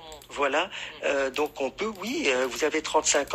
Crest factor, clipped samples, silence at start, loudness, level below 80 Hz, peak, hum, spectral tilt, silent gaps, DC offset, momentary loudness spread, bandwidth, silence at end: 18 dB; under 0.1%; 0 s; -27 LUFS; -58 dBFS; -8 dBFS; none; -1.5 dB/octave; none; under 0.1%; 7 LU; 16 kHz; 0 s